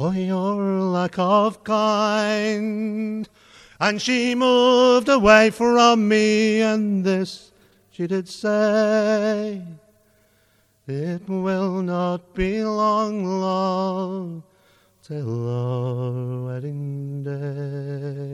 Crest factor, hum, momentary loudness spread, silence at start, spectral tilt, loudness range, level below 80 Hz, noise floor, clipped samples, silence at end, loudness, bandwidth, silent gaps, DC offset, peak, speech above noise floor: 20 dB; none; 14 LU; 0 s; -5.5 dB/octave; 11 LU; -50 dBFS; -61 dBFS; under 0.1%; 0 s; -21 LUFS; 12 kHz; none; under 0.1%; 0 dBFS; 41 dB